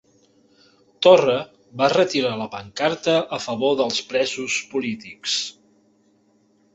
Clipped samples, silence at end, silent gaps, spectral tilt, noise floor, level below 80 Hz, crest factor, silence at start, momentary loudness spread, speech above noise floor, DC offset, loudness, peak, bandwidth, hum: under 0.1%; 1.25 s; none; -3.5 dB/octave; -61 dBFS; -64 dBFS; 20 dB; 1 s; 14 LU; 40 dB; under 0.1%; -21 LUFS; -2 dBFS; 8.2 kHz; none